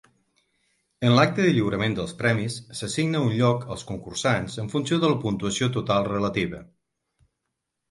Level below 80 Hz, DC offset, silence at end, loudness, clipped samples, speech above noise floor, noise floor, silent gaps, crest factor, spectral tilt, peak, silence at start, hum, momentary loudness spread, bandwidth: -54 dBFS; under 0.1%; 1.25 s; -24 LUFS; under 0.1%; 57 dB; -81 dBFS; none; 20 dB; -5.5 dB/octave; -6 dBFS; 1 s; none; 11 LU; 11.5 kHz